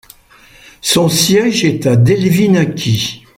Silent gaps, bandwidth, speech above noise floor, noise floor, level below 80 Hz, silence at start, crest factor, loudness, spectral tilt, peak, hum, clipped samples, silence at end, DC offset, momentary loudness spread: none; 16.5 kHz; 32 dB; -44 dBFS; -46 dBFS; 0.85 s; 14 dB; -12 LUFS; -5 dB/octave; 0 dBFS; none; under 0.1%; 0.2 s; under 0.1%; 5 LU